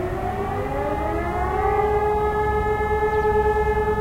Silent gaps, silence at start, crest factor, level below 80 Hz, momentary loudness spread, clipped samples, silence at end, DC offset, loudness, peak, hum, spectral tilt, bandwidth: none; 0 s; 12 dB; -32 dBFS; 6 LU; under 0.1%; 0 s; under 0.1%; -22 LUFS; -10 dBFS; none; -7.5 dB/octave; 16 kHz